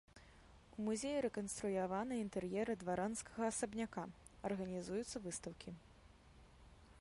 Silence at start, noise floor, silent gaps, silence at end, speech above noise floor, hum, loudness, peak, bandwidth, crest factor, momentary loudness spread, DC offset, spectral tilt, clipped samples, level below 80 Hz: 0.15 s; -64 dBFS; none; 0 s; 22 dB; none; -43 LUFS; -28 dBFS; 11.5 kHz; 16 dB; 12 LU; under 0.1%; -5 dB/octave; under 0.1%; -66 dBFS